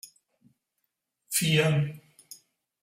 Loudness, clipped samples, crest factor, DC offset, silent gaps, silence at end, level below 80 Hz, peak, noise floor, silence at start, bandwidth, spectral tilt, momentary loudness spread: -26 LUFS; under 0.1%; 20 dB; under 0.1%; none; 0.5 s; -68 dBFS; -12 dBFS; -81 dBFS; 0.05 s; 16 kHz; -4 dB/octave; 25 LU